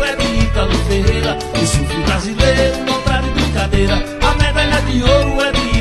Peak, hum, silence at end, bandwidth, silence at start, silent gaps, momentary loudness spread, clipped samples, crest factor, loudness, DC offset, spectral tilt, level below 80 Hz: 0 dBFS; none; 0 s; 12.5 kHz; 0 s; none; 4 LU; under 0.1%; 14 dB; -15 LUFS; under 0.1%; -5 dB/octave; -20 dBFS